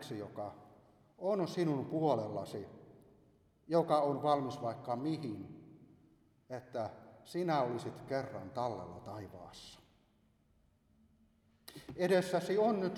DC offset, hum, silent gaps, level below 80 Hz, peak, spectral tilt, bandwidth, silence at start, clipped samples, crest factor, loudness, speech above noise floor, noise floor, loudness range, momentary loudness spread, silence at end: under 0.1%; none; none; -74 dBFS; -18 dBFS; -6.5 dB/octave; 15 kHz; 0 s; under 0.1%; 20 dB; -36 LUFS; 36 dB; -72 dBFS; 9 LU; 19 LU; 0 s